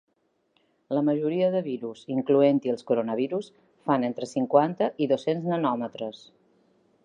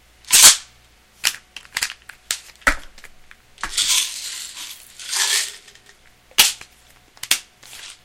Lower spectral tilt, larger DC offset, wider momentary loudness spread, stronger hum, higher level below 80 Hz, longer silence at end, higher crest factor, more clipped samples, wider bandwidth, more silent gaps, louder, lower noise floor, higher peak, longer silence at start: first, -7.5 dB/octave vs 2.5 dB/octave; neither; second, 12 LU vs 25 LU; neither; second, -80 dBFS vs -42 dBFS; first, 0.9 s vs 0.1 s; about the same, 20 dB vs 22 dB; neither; second, 9.8 kHz vs 17 kHz; neither; second, -26 LUFS vs -17 LUFS; first, -70 dBFS vs -52 dBFS; second, -6 dBFS vs 0 dBFS; first, 0.9 s vs 0.3 s